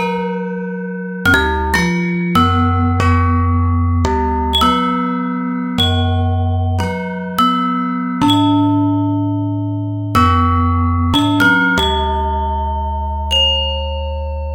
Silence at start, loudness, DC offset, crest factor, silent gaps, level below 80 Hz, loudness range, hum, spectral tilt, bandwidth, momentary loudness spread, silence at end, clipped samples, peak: 0 s; -15 LUFS; under 0.1%; 14 dB; none; -26 dBFS; 2 LU; none; -6 dB/octave; 17 kHz; 9 LU; 0 s; under 0.1%; 0 dBFS